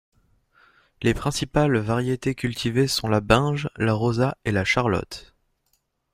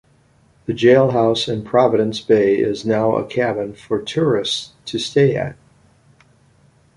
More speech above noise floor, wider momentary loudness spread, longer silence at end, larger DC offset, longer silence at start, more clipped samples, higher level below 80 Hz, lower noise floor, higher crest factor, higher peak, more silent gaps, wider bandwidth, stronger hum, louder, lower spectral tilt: first, 48 dB vs 38 dB; second, 6 LU vs 11 LU; second, 0.9 s vs 1.45 s; neither; first, 1 s vs 0.7 s; neither; first, -44 dBFS vs -54 dBFS; first, -71 dBFS vs -55 dBFS; about the same, 22 dB vs 18 dB; about the same, -2 dBFS vs -2 dBFS; neither; first, 15.5 kHz vs 11.5 kHz; neither; second, -23 LUFS vs -18 LUFS; about the same, -5.5 dB/octave vs -6 dB/octave